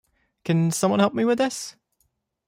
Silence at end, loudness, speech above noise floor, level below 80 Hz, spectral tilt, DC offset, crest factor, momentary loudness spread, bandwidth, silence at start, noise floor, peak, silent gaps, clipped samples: 0.75 s; -22 LUFS; 50 dB; -66 dBFS; -5.5 dB/octave; under 0.1%; 18 dB; 14 LU; 16 kHz; 0.45 s; -71 dBFS; -6 dBFS; none; under 0.1%